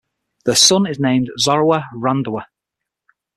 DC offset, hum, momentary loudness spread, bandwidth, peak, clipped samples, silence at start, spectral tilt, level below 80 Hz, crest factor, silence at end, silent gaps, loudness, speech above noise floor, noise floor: under 0.1%; none; 13 LU; 15 kHz; 0 dBFS; under 0.1%; 0.45 s; -3.5 dB/octave; -56 dBFS; 18 dB; 0.95 s; none; -15 LUFS; 66 dB; -82 dBFS